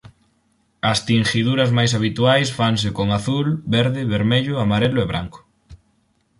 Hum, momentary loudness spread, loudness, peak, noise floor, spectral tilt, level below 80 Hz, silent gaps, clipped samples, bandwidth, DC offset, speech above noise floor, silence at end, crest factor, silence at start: none; 5 LU; -19 LUFS; -4 dBFS; -63 dBFS; -5.5 dB/octave; -46 dBFS; none; under 0.1%; 11.5 kHz; under 0.1%; 45 dB; 0.65 s; 16 dB; 0.85 s